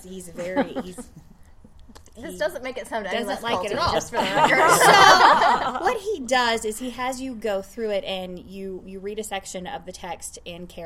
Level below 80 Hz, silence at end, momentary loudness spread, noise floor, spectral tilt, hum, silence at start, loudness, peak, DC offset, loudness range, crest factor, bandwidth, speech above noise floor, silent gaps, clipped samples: -50 dBFS; 0 s; 21 LU; -47 dBFS; -2.5 dB/octave; none; 0 s; -20 LUFS; 0 dBFS; under 0.1%; 13 LU; 22 dB; 16.5 kHz; 24 dB; none; under 0.1%